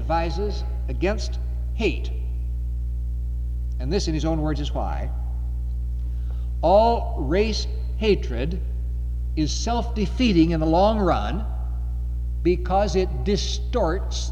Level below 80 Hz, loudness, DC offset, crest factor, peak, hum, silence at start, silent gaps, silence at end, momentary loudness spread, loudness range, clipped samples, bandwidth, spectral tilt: -26 dBFS; -24 LUFS; under 0.1%; 16 dB; -6 dBFS; 60 Hz at -25 dBFS; 0 s; none; 0 s; 10 LU; 5 LU; under 0.1%; 7.6 kHz; -6 dB/octave